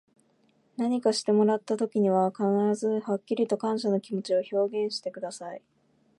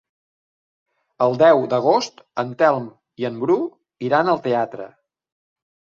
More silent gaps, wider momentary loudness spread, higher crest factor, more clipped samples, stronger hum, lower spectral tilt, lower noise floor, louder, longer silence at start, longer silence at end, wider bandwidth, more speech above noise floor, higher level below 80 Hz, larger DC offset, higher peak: neither; about the same, 13 LU vs 15 LU; about the same, 16 dB vs 20 dB; neither; neither; about the same, -6 dB/octave vs -6 dB/octave; second, -67 dBFS vs under -90 dBFS; second, -27 LUFS vs -19 LUFS; second, 0.8 s vs 1.2 s; second, 0.6 s vs 1.1 s; first, 11.5 kHz vs 7.4 kHz; second, 40 dB vs over 71 dB; second, -80 dBFS vs -68 dBFS; neither; second, -12 dBFS vs -2 dBFS